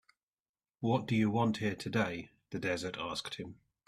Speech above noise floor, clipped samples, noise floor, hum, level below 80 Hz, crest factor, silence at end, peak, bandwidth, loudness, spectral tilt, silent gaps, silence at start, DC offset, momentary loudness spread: over 56 dB; under 0.1%; under -90 dBFS; none; -68 dBFS; 20 dB; 0.35 s; -16 dBFS; 13.5 kHz; -34 LUFS; -6 dB/octave; none; 0.8 s; under 0.1%; 14 LU